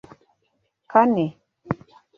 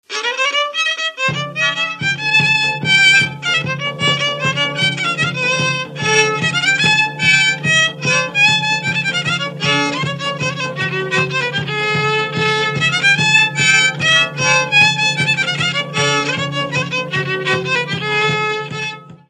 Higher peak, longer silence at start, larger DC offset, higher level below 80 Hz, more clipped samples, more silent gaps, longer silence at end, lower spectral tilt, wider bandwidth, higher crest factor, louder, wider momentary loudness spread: about the same, -2 dBFS vs 0 dBFS; first, 0.9 s vs 0.1 s; neither; about the same, -60 dBFS vs -60 dBFS; neither; neither; first, 0.45 s vs 0.15 s; first, -9 dB/octave vs -3 dB/octave; second, 6.6 kHz vs 12 kHz; first, 22 dB vs 16 dB; second, -22 LUFS vs -14 LUFS; first, 14 LU vs 8 LU